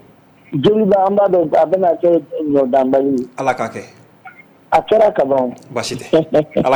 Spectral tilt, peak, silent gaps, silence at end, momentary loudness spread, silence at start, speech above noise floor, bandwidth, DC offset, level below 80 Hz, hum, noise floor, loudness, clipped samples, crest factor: -6.5 dB/octave; -4 dBFS; none; 0 s; 10 LU; 0.5 s; 32 dB; over 20 kHz; under 0.1%; -52 dBFS; none; -47 dBFS; -15 LUFS; under 0.1%; 12 dB